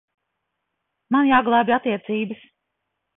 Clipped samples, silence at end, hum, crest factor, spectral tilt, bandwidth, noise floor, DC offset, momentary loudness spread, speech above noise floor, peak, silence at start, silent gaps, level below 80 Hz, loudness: under 0.1%; 0.85 s; none; 18 dB; -10 dB/octave; 4 kHz; -78 dBFS; under 0.1%; 12 LU; 59 dB; -6 dBFS; 1.1 s; none; -64 dBFS; -20 LUFS